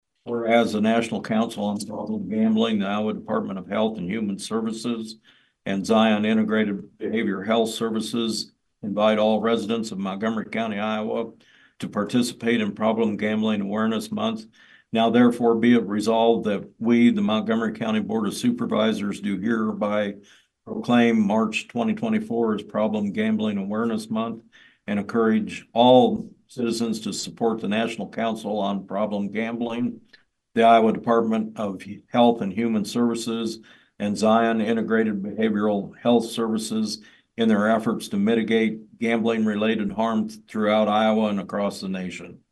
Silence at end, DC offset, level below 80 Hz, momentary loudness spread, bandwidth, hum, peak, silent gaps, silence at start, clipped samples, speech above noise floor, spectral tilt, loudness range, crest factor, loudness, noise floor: 0.2 s; under 0.1%; -66 dBFS; 11 LU; 12.5 kHz; none; -4 dBFS; none; 0.25 s; under 0.1%; 35 dB; -5.5 dB/octave; 4 LU; 20 dB; -23 LUFS; -58 dBFS